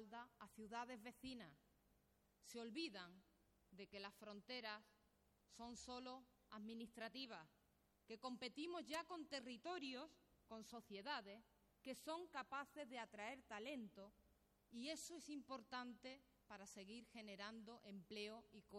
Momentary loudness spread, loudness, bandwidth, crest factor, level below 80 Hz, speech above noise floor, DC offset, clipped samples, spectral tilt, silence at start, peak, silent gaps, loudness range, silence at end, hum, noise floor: 11 LU; -55 LUFS; 16.5 kHz; 18 dB; -84 dBFS; 26 dB; under 0.1%; under 0.1%; -3 dB/octave; 0 s; -38 dBFS; none; 4 LU; 0 s; none; -81 dBFS